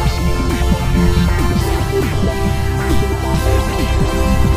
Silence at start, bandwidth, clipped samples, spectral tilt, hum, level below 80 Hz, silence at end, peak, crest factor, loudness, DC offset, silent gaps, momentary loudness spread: 0 s; 16 kHz; under 0.1%; -6 dB/octave; none; -18 dBFS; 0 s; 0 dBFS; 14 dB; -16 LUFS; under 0.1%; none; 3 LU